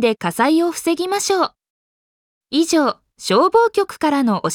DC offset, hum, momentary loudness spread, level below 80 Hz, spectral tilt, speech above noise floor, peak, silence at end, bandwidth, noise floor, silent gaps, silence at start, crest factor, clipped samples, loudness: under 0.1%; none; 7 LU; -62 dBFS; -4 dB/octave; over 73 dB; -4 dBFS; 0 s; 18 kHz; under -90 dBFS; 1.70-2.41 s; 0 s; 14 dB; under 0.1%; -17 LUFS